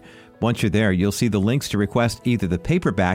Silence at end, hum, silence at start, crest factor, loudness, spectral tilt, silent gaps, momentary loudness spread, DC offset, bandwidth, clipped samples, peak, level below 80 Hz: 0 s; none; 0.05 s; 14 dB; -21 LUFS; -6 dB/octave; none; 3 LU; under 0.1%; 16.5 kHz; under 0.1%; -6 dBFS; -42 dBFS